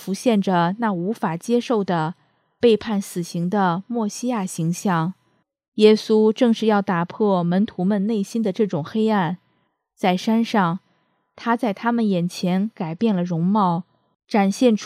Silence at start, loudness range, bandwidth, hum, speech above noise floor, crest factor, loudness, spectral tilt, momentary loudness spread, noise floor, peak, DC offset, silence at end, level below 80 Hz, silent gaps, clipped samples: 0 s; 3 LU; 14 kHz; none; 48 dB; 20 dB; -21 LUFS; -6.5 dB/octave; 8 LU; -68 dBFS; -2 dBFS; under 0.1%; 0 s; -68 dBFS; 5.68-5.72 s; under 0.1%